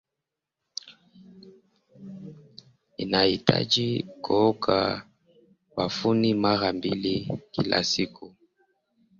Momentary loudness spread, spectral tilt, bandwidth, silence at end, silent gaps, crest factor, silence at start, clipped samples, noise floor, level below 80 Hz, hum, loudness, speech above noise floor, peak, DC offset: 17 LU; -5 dB/octave; 7.6 kHz; 0.9 s; none; 24 dB; 0.85 s; under 0.1%; -86 dBFS; -58 dBFS; none; -25 LUFS; 61 dB; -4 dBFS; under 0.1%